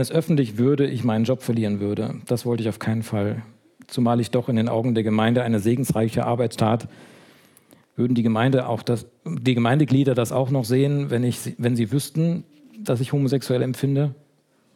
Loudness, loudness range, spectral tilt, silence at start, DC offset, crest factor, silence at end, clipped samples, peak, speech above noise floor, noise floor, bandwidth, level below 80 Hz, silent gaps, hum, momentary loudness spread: -22 LUFS; 3 LU; -7 dB/octave; 0 s; under 0.1%; 16 dB; 0.6 s; under 0.1%; -6 dBFS; 41 dB; -62 dBFS; 16.5 kHz; -62 dBFS; none; none; 7 LU